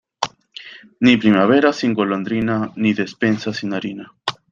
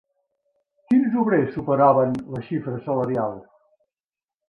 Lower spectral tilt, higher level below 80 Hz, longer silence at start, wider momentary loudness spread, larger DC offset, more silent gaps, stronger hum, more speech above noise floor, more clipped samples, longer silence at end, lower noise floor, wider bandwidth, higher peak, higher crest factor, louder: second, -6 dB/octave vs -10 dB/octave; about the same, -56 dBFS vs -60 dBFS; second, 0.2 s vs 0.9 s; first, 16 LU vs 12 LU; neither; neither; neither; second, 22 dB vs over 69 dB; neither; second, 0.2 s vs 1.1 s; second, -40 dBFS vs under -90 dBFS; first, 7.6 kHz vs 5.2 kHz; first, 0 dBFS vs -6 dBFS; about the same, 18 dB vs 18 dB; first, -18 LUFS vs -22 LUFS